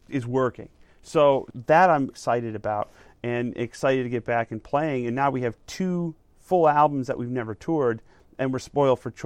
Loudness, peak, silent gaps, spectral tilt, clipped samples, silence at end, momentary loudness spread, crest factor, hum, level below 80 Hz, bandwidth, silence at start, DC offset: -24 LUFS; -6 dBFS; none; -6.5 dB/octave; under 0.1%; 0 s; 11 LU; 18 dB; none; -58 dBFS; 13.5 kHz; 0.1 s; under 0.1%